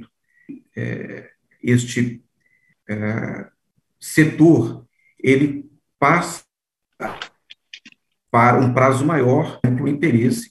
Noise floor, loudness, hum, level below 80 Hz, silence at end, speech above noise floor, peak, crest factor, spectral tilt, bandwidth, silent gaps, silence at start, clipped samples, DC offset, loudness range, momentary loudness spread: -78 dBFS; -18 LUFS; none; -58 dBFS; 0.05 s; 61 dB; 0 dBFS; 18 dB; -6.5 dB/octave; 12.5 kHz; none; 0 s; under 0.1%; under 0.1%; 7 LU; 20 LU